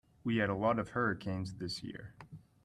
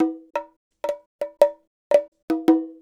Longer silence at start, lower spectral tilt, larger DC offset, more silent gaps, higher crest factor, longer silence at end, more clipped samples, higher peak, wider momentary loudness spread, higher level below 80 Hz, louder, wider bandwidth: first, 0.25 s vs 0 s; about the same, -6.5 dB/octave vs -5.5 dB/octave; neither; second, none vs 0.56-0.71 s, 1.06-1.19 s, 1.67-1.90 s, 2.08-2.12 s, 2.22-2.28 s; about the same, 18 dB vs 22 dB; first, 0.25 s vs 0.1 s; neither; second, -18 dBFS vs -2 dBFS; first, 20 LU vs 12 LU; first, -64 dBFS vs -70 dBFS; second, -35 LUFS vs -23 LUFS; second, 12.5 kHz vs 14.5 kHz